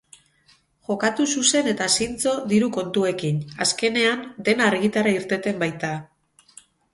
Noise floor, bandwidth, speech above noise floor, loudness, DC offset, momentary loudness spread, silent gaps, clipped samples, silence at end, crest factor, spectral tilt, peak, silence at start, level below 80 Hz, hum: -60 dBFS; 12 kHz; 38 dB; -22 LUFS; under 0.1%; 7 LU; none; under 0.1%; 0.9 s; 20 dB; -3.5 dB/octave; -4 dBFS; 0.9 s; -60 dBFS; none